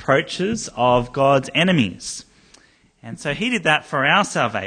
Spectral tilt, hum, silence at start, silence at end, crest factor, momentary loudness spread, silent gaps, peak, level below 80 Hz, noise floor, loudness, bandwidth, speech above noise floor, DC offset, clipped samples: -4.5 dB/octave; none; 0 s; 0 s; 18 dB; 13 LU; none; -2 dBFS; -50 dBFS; -53 dBFS; -19 LUFS; 10 kHz; 34 dB; under 0.1%; under 0.1%